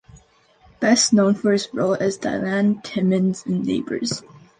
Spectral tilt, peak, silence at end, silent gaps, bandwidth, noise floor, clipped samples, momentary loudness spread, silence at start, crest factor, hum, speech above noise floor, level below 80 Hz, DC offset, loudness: -4.5 dB/octave; -6 dBFS; 0.2 s; none; 9.6 kHz; -55 dBFS; under 0.1%; 9 LU; 0.15 s; 16 dB; none; 35 dB; -58 dBFS; under 0.1%; -20 LUFS